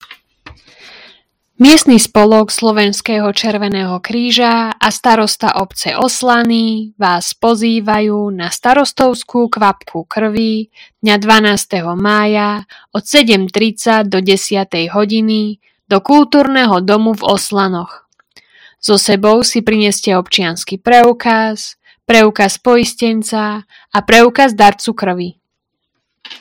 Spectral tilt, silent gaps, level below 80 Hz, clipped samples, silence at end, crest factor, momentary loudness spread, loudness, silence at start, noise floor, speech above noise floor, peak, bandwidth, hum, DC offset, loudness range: -3.5 dB/octave; none; -46 dBFS; 1%; 0.05 s; 12 dB; 10 LU; -11 LUFS; 0.1 s; -73 dBFS; 61 dB; 0 dBFS; 17.5 kHz; none; under 0.1%; 3 LU